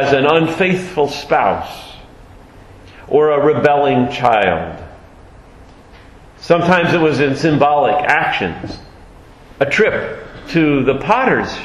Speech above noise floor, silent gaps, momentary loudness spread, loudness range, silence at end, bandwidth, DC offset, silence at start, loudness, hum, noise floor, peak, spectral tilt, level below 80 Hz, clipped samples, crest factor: 27 dB; none; 16 LU; 2 LU; 0 s; 12.5 kHz; under 0.1%; 0 s; -14 LUFS; none; -41 dBFS; 0 dBFS; -6 dB/octave; -42 dBFS; under 0.1%; 16 dB